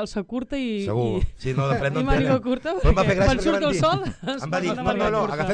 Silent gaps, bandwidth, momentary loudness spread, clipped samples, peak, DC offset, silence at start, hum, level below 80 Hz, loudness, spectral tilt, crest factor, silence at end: none; 10 kHz; 8 LU; under 0.1%; -8 dBFS; under 0.1%; 0 s; none; -32 dBFS; -23 LUFS; -6.5 dB/octave; 14 dB; 0 s